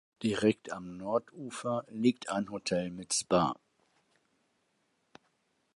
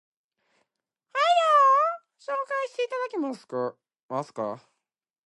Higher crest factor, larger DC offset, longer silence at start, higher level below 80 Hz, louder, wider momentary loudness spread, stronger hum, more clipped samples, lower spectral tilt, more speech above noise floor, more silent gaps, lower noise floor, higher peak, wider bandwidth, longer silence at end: about the same, 22 dB vs 18 dB; neither; second, 0.2 s vs 1.15 s; first, -68 dBFS vs -88 dBFS; second, -32 LUFS vs -25 LUFS; second, 11 LU vs 16 LU; neither; neither; about the same, -4.5 dB/octave vs -4 dB/octave; second, 44 dB vs 54 dB; second, none vs 4.03-4.09 s; second, -76 dBFS vs -85 dBFS; second, -14 dBFS vs -10 dBFS; about the same, 11.5 kHz vs 11.5 kHz; first, 2.25 s vs 0.7 s